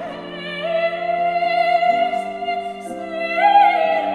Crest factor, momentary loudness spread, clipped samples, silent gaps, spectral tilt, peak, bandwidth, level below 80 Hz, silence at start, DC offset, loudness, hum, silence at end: 16 dB; 15 LU; under 0.1%; none; -4.5 dB/octave; -4 dBFS; 10.5 kHz; -62 dBFS; 0 s; under 0.1%; -18 LUFS; none; 0 s